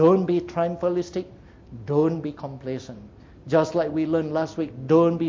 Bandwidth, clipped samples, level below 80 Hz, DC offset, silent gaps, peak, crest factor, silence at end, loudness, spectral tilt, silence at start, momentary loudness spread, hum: 7.6 kHz; under 0.1%; -54 dBFS; under 0.1%; none; -6 dBFS; 16 dB; 0 s; -24 LUFS; -8 dB/octave; 0 s; 21 LU; none